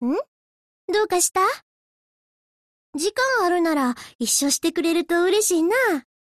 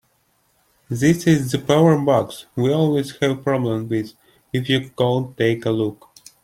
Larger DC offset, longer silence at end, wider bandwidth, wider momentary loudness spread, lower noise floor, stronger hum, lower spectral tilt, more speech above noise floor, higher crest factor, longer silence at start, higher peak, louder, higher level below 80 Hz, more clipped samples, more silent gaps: neither; about the same, 0.4 s vs 0.5 s; second, 13.5 kHz vs 16 kHz; about the same, 10 LU vs 10 LU; first, under -90 dBFS vs -64 dBFS; neither; second, -1 dB/octave vs -6.5 dB/octave; first, over 69 dB vs 45 dB; about the same, 14 dB vs 18 dB; second, 0 s vs 0.9 s; second, -8 dBFS vs -2 dBFS; about the same, -21 LUFS vs -20 LUFS; second, -64 dBFS vs -54 dBFS; neither; first, 0.28-0.88 s, 1.62-2.93 s, 4.15-4.19 s vs none